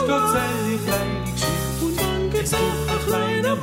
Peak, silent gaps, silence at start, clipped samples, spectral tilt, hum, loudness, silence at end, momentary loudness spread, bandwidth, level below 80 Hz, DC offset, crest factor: -8 dBFS; none; 0 s; under 0.1%; -4.5 dB/octave; none; -22 LUFS; 0 s; 4 LU; 16.5 kHz; -36 dBFS; under 0.1%; 14 dB